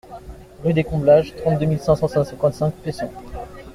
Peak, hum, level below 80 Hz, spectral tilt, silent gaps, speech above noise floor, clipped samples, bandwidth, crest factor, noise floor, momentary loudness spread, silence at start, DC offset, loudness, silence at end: -2 dBFS; none; -42 dBFS; -8 dB/octave; none; 19 dB; under 0.1%; 13.5 kHz; 18 dB; -38 dBFS; 20 LU; 0.1 s; under 0.1%; -20 LUFS; 0 s